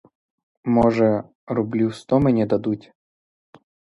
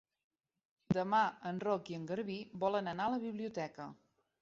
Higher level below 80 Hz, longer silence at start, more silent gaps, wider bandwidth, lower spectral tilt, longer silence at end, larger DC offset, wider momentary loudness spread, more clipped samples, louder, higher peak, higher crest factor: first, -50 dBFS vs -72 dBFS; second, 0.65 s vs 0.9 s; first, 1.35-1.47 s vs none; first, 11 kHz vs 7.6 kHz; first, -8.5 dB/octave vs -5 dB/octave; first, 1.2 s vs 0.5 s; neither; about the same, 10 LU vs 10 LU; neither; first, -21 LUFS vs -37 LUFS; first, -4 dBFS vs -20 dBFS; about the same, 18 dB vs 18 dB